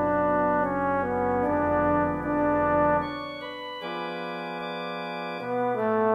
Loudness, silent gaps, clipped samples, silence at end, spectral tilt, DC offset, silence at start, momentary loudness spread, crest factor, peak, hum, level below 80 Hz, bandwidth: -27 LUFS; none; under 0.1%; 0 s; -8 dB/octave; under 0.1%; 0 s; 10 LU; 14 dB; -12 dBFS; none; -50 dBFS; 6 kHz